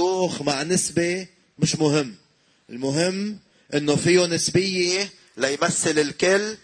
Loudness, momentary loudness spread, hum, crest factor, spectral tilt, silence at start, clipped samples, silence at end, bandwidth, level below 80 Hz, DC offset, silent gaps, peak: -22 LUFS; 12 LU; none; 16 dB; -4 dB/octave; 0 s; under 0.1%; 0.1 s; 10.5 kHz; -58 dBFS; under 0.1%; none; -6 dBFS